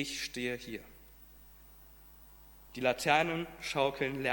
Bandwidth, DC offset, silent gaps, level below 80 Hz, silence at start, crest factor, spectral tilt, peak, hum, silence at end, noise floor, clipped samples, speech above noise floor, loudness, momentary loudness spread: 17 kHz; under 0.1%; none; -60 dBFS; 0 s; 24 dB; -4 dB/octave; -12 dBFS; none; 0 s; -56 dBFS; under 0.1%; 23 dB; -33 LUFS; 27 LU